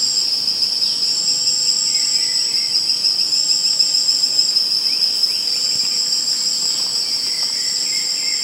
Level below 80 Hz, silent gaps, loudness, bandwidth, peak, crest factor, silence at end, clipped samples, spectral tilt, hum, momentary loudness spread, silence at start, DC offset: -72 dBFS; none; -15 LUFS; 16 kHz; -2 dBFS; 16 dB; 0 s; under 0.1%; 2 dB/octave; none; 4 LU; 0 s; under 0.1%